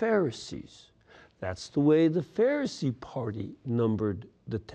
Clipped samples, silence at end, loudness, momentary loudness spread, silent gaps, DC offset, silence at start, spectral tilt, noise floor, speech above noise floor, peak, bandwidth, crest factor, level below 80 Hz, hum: under 0.1%; 0 s; -29 LUFS; 15 LU; none; under 0.1%; 0 s; -7 dB/octave; -57 dBFS; 29 dB; -12 dBFS; 9.4 kHz; 16 dB; -62 dBFS; none